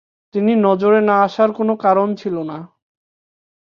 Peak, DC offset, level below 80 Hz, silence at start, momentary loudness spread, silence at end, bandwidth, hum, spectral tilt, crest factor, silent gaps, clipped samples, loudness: -2 dBFS; under 0.1%; -66 dBFS; 0.35 s; 12 LU; 1.15 s; 6.8 kHz; none; -8 dB/octave; 16 dB; none; under 0.1%; -16 LUFS